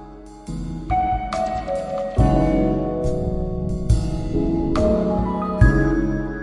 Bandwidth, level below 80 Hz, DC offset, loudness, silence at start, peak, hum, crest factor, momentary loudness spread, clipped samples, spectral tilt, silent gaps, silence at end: 11 kHz; -26 dBFS; under 0.1%; -21 LUFS; 0 s; 0 dBFS; none; 20 dB; 8 LU; under 0.1%; -8 dB/octave; none; 0 s